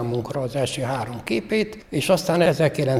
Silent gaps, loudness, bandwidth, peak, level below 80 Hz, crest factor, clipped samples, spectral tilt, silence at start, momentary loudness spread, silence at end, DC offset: none; -23 LUFS; 16 kHz; -4 dBFS; -50 dBFS; 18 dB; under 0.1%; -5.5 dB/octave; 0 s; 8 LU; 0 s; under 0.1%